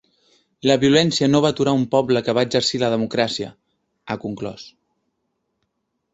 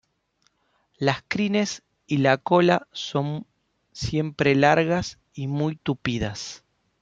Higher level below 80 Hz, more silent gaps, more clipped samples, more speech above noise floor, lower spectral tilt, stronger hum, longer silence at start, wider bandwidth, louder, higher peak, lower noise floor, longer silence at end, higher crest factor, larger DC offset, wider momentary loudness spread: about the same, -56 dBFS vs -52 dBFS; neither; neither; first, 55 dB vs 46 dB; about the same, -5 dB/octave vs -5.5 dB/octave; neither; second, 0.65 s vs 1 s; about the same, 8 kHz vs 7.8 kHz; first, -19 LUFS vs -24 LUFS; about the same, -2 dBFS vs -2 dBFS; first, -74 dBFS vs -69 dBFS; first, 1.45 s vs 0.45 s; about the same, 20 dB vs 22 dB; neither; about the same, 15 LU vs 15 LU